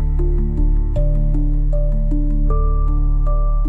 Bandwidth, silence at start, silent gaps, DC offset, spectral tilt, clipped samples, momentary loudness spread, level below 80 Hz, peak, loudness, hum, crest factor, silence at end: 1.3 kHz; 0 s; none; under 0.1%; -11.5 dB/octave; under 0.1%; 1 LU; -16 dBFS; -6 dBFS; -20 LUFS; none; 8 dB; 0 s